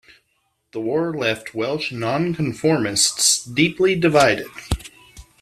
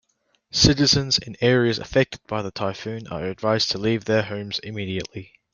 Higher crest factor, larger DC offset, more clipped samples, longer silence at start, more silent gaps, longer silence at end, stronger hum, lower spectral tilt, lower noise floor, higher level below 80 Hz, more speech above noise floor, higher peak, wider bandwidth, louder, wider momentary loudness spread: about the same, 20 dB vs 22 dB; neither; neither; first, 0.75 s vs 0.55 s; neither; about the same, 0.2 s vs 0.3 s; neither; about the same, -3.5 dB/octave vs -4.5 dB/octave; about the same, -69 dBFS vs -68 dBFS; about the same, -42 dBFS vs -44 dBFS; first, 49 dB vs 45 dB; about the same, -2 dBFS vs -2 dBFS; first, 15 kHz vs 7.4 kHz; first, -19 LUFS vs -22 LUFS; about the same, 13 LU vs 13 LU